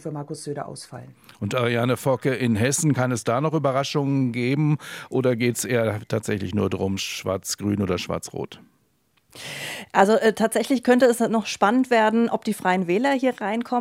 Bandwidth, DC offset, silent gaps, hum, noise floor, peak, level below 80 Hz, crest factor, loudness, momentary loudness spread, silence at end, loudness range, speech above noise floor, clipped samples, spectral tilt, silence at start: 16.5 kHz; under 0.1%; none; none; -66 dBFS; -2 dBFS; -66 dBFS; 20 dB; -22 LUFS; 14 LU; 0 s; 7 LU; 44 dB; under 0.1%; -5 dB/octave; 0.05 s